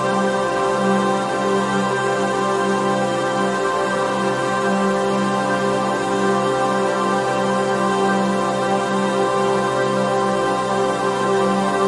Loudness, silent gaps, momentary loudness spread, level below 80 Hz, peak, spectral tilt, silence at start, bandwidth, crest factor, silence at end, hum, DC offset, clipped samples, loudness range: -19 LUFS; none; 2 LU; -54 dBFS; -6 dBFS; -5 dB/octave; 0 s; 11.5 kHz; 12 dB; 0 s; none; under 0.1%; under 0.1%; 1 LU